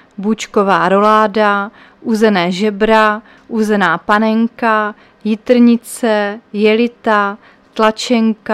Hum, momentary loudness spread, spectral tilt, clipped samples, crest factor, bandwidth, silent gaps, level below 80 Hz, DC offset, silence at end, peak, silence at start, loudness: none; 10 LU; -5.5 dB/octave; under 0.1%; 14 dB; 13.5 kHz; none; -50 dBFS; under 0.1%; 0 s; 0 dBFS; 0.2 s; -13 LUFS